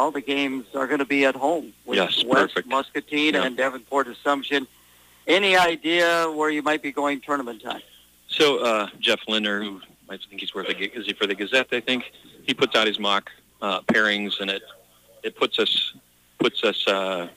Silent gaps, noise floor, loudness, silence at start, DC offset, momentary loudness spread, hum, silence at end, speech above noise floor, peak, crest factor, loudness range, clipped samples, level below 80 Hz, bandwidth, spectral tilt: none; -54 dBFS; -22 LUFS; 0 s; under 0.1%; 12 LU; 60 Hz at -65 dBFS; 0.05 s; 31 dB; -6 dBFS; 18 dB; 3 LU; under 0.1%; -66 dBFS; 15.5 kHz; -3.5 dB/octave